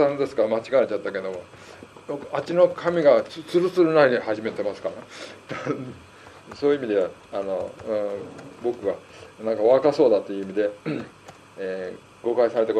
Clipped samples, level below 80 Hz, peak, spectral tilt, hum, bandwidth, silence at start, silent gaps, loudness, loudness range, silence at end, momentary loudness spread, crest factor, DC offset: under 0.1%; -66 dBFS; -4 dBFS; -6.5 dB/octave; none; 11 kHz; 0 s; none; -23 LUFS; 6 LU; 0 s; 19 LU; 20 dB; under 0.1%